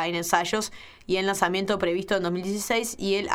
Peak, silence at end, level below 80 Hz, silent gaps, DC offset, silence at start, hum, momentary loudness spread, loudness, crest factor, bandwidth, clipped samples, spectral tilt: -4 dBFS; 0 s; -56 dBFS; none; under 0.1%; 0 s; none; 5 LU; -26 LUFS; 22 dB; 17.5 kHz; under 0.1%; -3.5 dB/octave